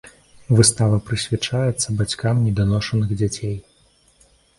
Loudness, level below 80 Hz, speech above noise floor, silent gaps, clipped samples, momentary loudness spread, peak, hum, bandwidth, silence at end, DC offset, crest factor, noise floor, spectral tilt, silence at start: -20 LUFS; -42 dBFS; 38 dB; none; under 0.1%; 8 LU; 0 dBFS; none; 11.5 kHz; 0.95 s; under 0.1%; 20 dB; -57 dBFS; -5 dB/octave; 0.05 s